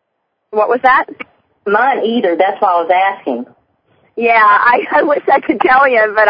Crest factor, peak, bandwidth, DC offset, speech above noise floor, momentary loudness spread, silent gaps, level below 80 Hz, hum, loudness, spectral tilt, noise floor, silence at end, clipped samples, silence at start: 12 dB; 0 dBFS; 5.2 kHz; under 0.1%; 57 dB; 15 LU; none; -56 dBFS; none; -12 LUFS; -7 dB/octave; -69 dBFS; 0 s; under 0.1%; 0.5 s